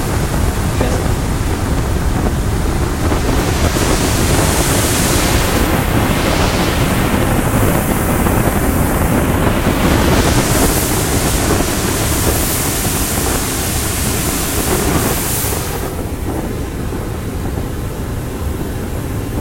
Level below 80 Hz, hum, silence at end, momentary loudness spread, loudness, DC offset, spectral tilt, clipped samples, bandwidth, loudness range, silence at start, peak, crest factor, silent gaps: -22 dBFS; none; 0 s; 9 LU; -15 LUFS; under 0.1%; -4.5 dB/octave; under 0.1%; 16.5 kHz; 5 LU; 0 s; 0 dBFS; 14 dB; none